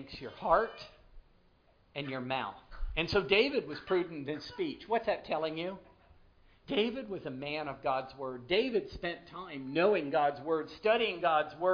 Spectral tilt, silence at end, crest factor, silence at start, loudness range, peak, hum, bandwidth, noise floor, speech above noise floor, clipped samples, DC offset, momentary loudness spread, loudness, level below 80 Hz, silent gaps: -6 dB/octave; 0 s; 20 dB; 0 s; 4 LU; -14 dBFS; none; 5.2 kHz; -66 dBFS; 33 dB; under 0.1%; under 0.1%; 13 LU; -33 LUFS; -52 dBFS; none